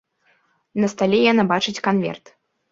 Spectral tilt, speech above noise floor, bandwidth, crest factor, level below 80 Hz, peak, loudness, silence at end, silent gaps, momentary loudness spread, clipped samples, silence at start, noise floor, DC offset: -5.5 dB/octave; 44 dB; 7.8 kHz; 20 dB; -60 dBFS; -2 dBFS; -19 LUFS; 0.55 s; none; 13 LU; under 0.1%; 0.75 s; -63 dBFS; under 0.1%